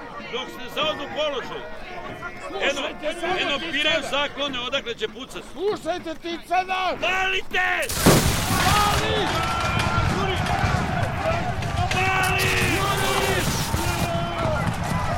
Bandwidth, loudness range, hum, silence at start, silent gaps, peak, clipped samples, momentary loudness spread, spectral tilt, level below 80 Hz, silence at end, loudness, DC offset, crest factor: 16.5 kHz; 5 LU; none; 0 s; none; -4 dBFS; under 0.1%; 11 LU; -4 dB/octave; -36 dBFS; 0 s; -23 LUFS; under 0.1%; 20 dB